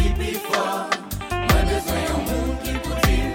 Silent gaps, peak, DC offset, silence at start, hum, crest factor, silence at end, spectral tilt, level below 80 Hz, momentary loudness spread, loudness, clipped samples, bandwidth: none; -4 dBFS; under 0.1%; 0 s; none; 18 dB; 0 s; -5 dB/octave; -26 dBFS; 6 LU; -23 LUFS; under 0.1%; 17 kHz